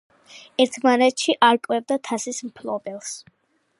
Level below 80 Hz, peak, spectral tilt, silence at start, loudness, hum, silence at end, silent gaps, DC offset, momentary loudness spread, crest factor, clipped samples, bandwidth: -76 dBFS; -2 dBFS; -2.5 dB/octave; 0.35 s; -21 LUFS; none; 0.6 s; none; under 0.1%; 15 LU; 20 dB; under 0.1%; 11.5 kHz